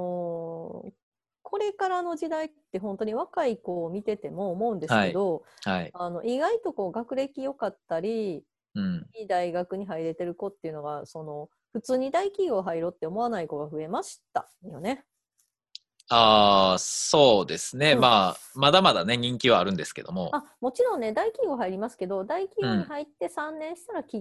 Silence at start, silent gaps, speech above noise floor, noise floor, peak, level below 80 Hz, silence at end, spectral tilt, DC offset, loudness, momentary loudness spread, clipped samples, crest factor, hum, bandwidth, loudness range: 0 s; 1.03-1.12 s; 48 dB; -75 dBFS; -4 dBFS; -62 dBFS; 0 s; -4 dB/octave; under 0.1%; -26 LUFS; 16 LU; under 0.1%; 24 dB; none; 12.5 kHz; 11 LU